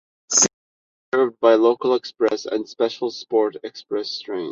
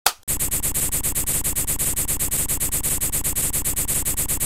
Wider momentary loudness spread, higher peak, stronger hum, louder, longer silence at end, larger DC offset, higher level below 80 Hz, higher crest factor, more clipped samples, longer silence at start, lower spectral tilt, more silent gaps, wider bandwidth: first, 11 LU vs 1 LU; about the same, -2 dBFS vs 0 dBFS; neither; about the same, -20 LUFS vs -21 LUFS; about the same, 0 s vs 0 s; second, under 0.1% vs 2%; second, -70 dBFS vs -34 dBFS; second, 18 dB vs 24 dB; neither; first, 0.3 s vs 0.05 s; about the same, -2 dB/octave vs -1.5 dB/octave; first, 0.53-1.12 s vs 0.23-0.27 s; second, 8.4 kHz vs 17 kHz